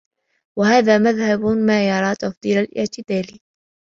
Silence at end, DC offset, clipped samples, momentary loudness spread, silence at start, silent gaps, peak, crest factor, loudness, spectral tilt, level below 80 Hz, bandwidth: 0.6 s; under 0.1%; under 0.1%; 10 LU; 0.55 s; 2.37-2.41 s; -2 dBFS; 18 dB; -18 LUFS; -5.5 dB/octave; -56 dBFS; 7.4 kHz